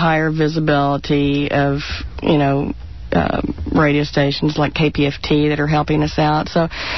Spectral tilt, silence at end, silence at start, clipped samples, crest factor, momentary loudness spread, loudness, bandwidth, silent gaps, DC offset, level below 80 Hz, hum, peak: -7 dB/octave; 0 s; 0 s; under 0.1%; 12 dB; 6 LU; -17 LUFS; 6.2 kHz; none; 1%; -34 dBFS; none; -4 dBFS